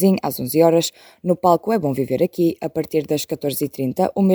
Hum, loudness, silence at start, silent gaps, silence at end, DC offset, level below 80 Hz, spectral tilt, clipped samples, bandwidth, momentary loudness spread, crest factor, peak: none; -20 LUFS; 0 s; none; 0 s; under 0.1%; -60 dBFS; -6 dB/octave; under 0.1%; over 20 kHz; 7 LU; 18 dB; -2 dBFS